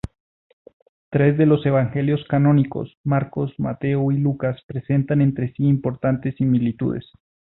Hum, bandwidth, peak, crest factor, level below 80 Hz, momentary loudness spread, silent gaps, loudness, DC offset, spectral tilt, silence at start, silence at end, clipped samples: none; 4.1 kHz; -6 dBFS; 16 dB; -50 dBFS; 9 LU; 2.97-3.04 s, 4.64-4.69 s; -21 LUFS; under 0.1%; -11 dB/octave; 1.1 s; 0.55 s; under 0.1%